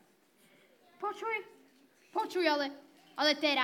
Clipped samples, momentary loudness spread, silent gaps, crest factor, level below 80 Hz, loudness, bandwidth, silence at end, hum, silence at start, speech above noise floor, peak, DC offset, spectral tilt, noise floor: under 0.1%; 12 LU; none; 22 dB; under -90 dBFS; -33 LUFS; 17.5 kHz; 0 s; none; 1 s; 35 dB; -14 dBFS; under 0.1%; -1.5 dB/octave; -67 dBFS